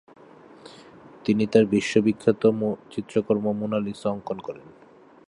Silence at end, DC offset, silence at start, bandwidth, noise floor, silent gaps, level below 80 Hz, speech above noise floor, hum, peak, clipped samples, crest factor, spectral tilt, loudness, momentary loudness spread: 0.6 s; under 0.1%; 0.65 s; 11 kHz; -49 dBFS; none; -62 dBFS; 25 dB; none; -4 dBFS; under 0.1%; 22 dB; -6.5 dB/octave; -24 LUFS; 13 LU